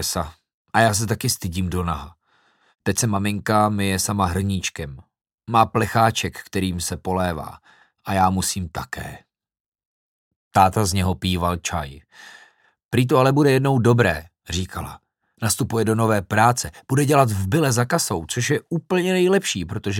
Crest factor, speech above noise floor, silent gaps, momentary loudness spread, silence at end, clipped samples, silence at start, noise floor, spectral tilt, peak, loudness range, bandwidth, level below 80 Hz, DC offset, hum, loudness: 20 dB; 41 dB; 0.54-0.65 s, 5.34-5.38 s, 9.60-9.72 s, 9.85-10.51 s, 12.85-12.89 s; 12 LU; 0 s; under 0.1%; 0 s; -62 dBFS; -5 dB/octave; -2 dBFS; 4 LU; 17 kHz; -44 dBFS; under 0.1%; none; -21 LUFS